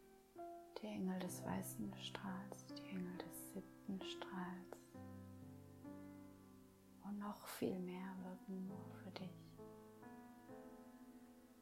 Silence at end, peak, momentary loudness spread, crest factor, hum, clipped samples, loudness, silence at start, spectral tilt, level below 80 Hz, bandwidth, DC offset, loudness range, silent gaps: 0 s; -30 dBFS; 15 LU; 22 dB; none; under 0.1%; -51 LUFS; 0 s; -5.5 dB/octave; -78 dBFS; 16 kHz; under 0.1%; 6 LU; none